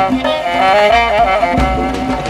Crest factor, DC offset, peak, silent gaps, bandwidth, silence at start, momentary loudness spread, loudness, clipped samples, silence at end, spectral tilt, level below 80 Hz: 10 dB; under 0.1%; -2 dBFS; none; 14.5 kHz; 0 s; 6 LU; -12 LUFS; under 0.1%; 0 s; -5 dB/octave; -26 dBFS